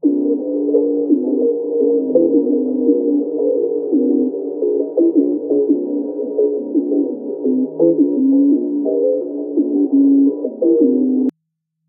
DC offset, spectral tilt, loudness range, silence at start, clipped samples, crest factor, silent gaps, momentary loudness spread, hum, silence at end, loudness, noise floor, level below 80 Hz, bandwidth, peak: under 0.1%; -11.5 dB/octave; 2 LU; 0.05 s; under 0.1%; 14 dB; none; 6 LU; none; 0.6 s; -16 LUFS; -74 dBFS; -80 dBFS; 1.1 kHz; -2 dBFS